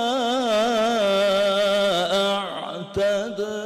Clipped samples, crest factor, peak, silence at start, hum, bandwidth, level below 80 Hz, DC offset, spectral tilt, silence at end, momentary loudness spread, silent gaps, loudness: under 0.1%; 6 dB; -16 dBFS; 0 s; none; 14 kHz; -58 dBFS; under 0.1%; -3.5 dB/octave; 0 s; 8 LU; none; -21 LUFS